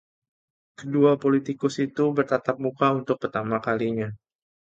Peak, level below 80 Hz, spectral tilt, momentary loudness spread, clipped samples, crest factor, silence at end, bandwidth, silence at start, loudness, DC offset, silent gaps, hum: -8 dBFS; -64 dBFS; -7 dB/octave; 8 LU; under 0.1%; 18 dB; 0.6 s; 8 kHz; 0.8 s; -24 LUFS; under 0.1%; none; none